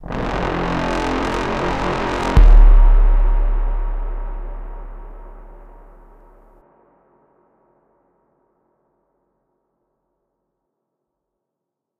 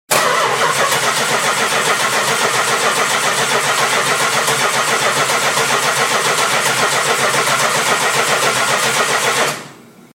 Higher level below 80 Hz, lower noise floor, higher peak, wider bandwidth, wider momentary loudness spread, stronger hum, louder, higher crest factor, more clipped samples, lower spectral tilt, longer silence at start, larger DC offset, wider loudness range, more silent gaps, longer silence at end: first, -18 dBFS vs -60 dBFS; first, -82 dBFS vs -39 dBFS; about the same, 0 dBFS vs 0 dBFS; second, 7 kHz vs 16.5 kHz; first, 23 LU vs 1 LU; neither; second, -19 LUFS vs -14 LUFS; about the same, 16 dB vs 16 dB; neither; first, -6.5 dB/octave vs -1 dB/octave; about the same, 0.05 s vs 0.1 s; neither; first, 20 LU vs 0 LU; neither; first, 6.55 s vs 0.35 s